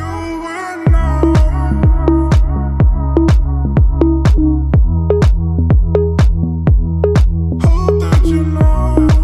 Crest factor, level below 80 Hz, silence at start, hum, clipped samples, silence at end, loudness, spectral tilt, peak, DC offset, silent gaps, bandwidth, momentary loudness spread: 10 dB; -14 dBFS; 0 s; none; under 0.1%; 0 s; -13 LUFS; -8.5 dB/octave; 0 dBFS; under 0.1%; none; 10.5 kHz; 3 LU